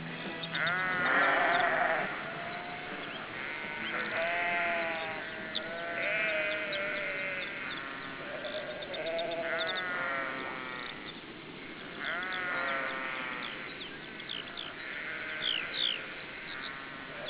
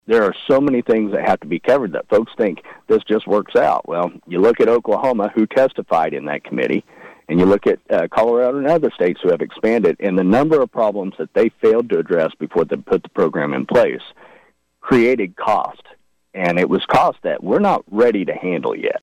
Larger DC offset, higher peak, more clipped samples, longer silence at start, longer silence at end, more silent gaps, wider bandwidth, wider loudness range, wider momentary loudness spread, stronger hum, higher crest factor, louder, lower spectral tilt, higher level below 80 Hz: neither; second, -16 dBFS vs -6 dBFS; neither; about the same, 0 s vs 0.1 s; about the same, 0 s vs 0.05 s; neither; second, 4 kHz vs 9.8 kHz; first, 5 LU vs 2 LU; first, 11 LU vs 7 LU; neither; first, 20 dB vs 10 dB; second, -33 LUFS vs -17 LUFS; second, -0.5 dB/octave vs -7.5 dB/octave; second, -68 dBFS vs -54 dBFS